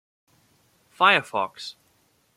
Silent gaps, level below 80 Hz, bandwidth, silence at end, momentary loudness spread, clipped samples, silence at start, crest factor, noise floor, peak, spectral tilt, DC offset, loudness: none; -78 dBFS; 16 kHz; 0.65 s; 20 LU; under 0.1%; 1 s; 24 dB; -65 dBFS; -2 dBFS; -3 dB/octave; under 0.1%; -21 LUFS